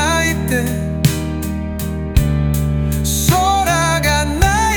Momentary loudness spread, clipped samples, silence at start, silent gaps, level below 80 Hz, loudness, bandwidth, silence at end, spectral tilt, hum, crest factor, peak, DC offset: 8 LU; under 0.1%; 0 s; none; -24 dBFS; -16 LUFS; over 20 kHz; 0 s; -4.5 dB/octave; none; 16 dB; 0 dBFS; under 0.1%